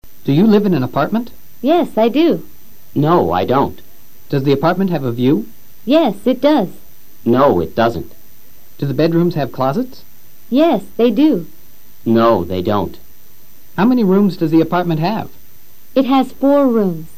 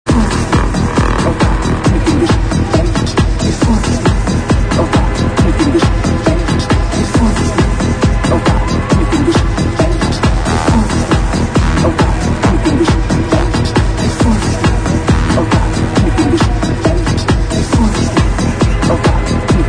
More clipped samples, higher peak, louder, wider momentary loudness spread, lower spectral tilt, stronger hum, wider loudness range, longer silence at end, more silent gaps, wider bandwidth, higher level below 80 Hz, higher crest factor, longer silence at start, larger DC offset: neither; about the same, 0 dBFS vs 0 dBFS; about the same, -15 LUFS vs -13 LUFS; first, 12 LU vs 2 LU; first, -8 dB/octave vs -6 dB/octave; neither; about the same, 2 LU vs 0 LU; about the same, 0.1 s vs 0 s; neither; first, 15.5 kHz vs 10 kHz; second, -48 dBFS vs -16 dBFS; about the same, 14 dB vs 12 dB; about the same, 0 s vs 0.05 s; first, 4% vs under 0.1%